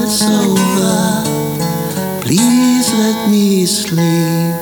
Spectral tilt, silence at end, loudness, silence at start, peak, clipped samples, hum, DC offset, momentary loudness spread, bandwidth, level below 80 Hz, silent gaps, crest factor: -4.5 dB/octave; 0 s; -13 LUFS; 0 s; 0 dBFS; under 0.1%; none; under 0.1%; 6 LU; over 20 kHz; -50 dBFS; none; 12 dB